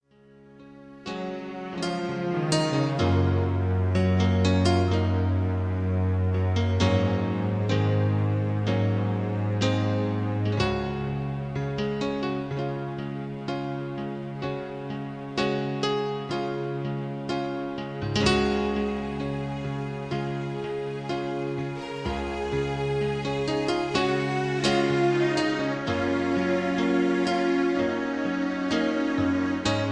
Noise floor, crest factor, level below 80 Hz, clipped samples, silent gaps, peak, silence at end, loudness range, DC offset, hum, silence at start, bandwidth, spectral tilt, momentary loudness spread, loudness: -54 dBFS; 18 dB; -48 dBFS; under 0.1%; none; -8 dBFS; 0 s; 6 LU; under 0.1%; none; 0.45 s; 9.8 kHz; -6.5 dB/octave; 9 LU; -27 LUFS